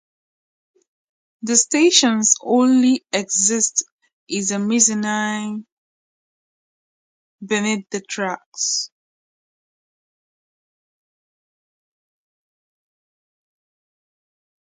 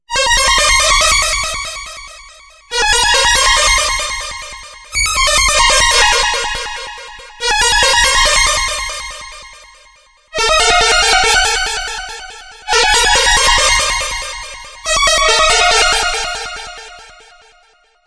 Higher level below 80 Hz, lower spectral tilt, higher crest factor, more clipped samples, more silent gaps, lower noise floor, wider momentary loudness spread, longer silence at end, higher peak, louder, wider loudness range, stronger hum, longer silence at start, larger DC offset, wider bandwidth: second, -72 dBFS vs -28 dBFS; first, -2 dB/octave vs 0.5 dB/octave; first, 22 dB vs 14 dB; neither; first, 3.92-3.99 s, 4.13-4.27 s, 5.72-7.38 s, 8.46-8.52 s vs none; first, under -90 dBFS vs -52 dBFS; second, 14 LU vs 18 LU; first, 5.9 s vs 1 s; about the same, 0 dBFS vs 0 dBFS; second, -18 LUFS vs -11 LUFS; first, 11 LU vs 2 LU; neither; first, 1.45 s vs 0.1 s; neither; second, 9.6 kHz vs 11 kHz